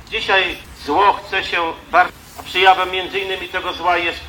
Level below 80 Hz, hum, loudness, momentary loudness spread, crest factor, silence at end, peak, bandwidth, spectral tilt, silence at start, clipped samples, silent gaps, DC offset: -46 dBFS; none; -17 LUFS; 9 LU; 18 dB; 0 s; 0 dBFS; 18 kHz; -3 dB/octave; 0 s; under 0.1%; none; under 0.1%